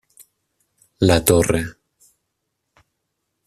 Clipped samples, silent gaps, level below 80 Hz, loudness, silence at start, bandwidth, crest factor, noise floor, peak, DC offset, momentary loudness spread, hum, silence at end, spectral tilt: under 0.1%; none; -42 dBFS; -17 LUFS; 1 s; 14.5 kHz; 22 dB; -76 dBFS; 0 dBFS; under 0.1%; 10 LU; none; 1.75 s; -5 dB/octave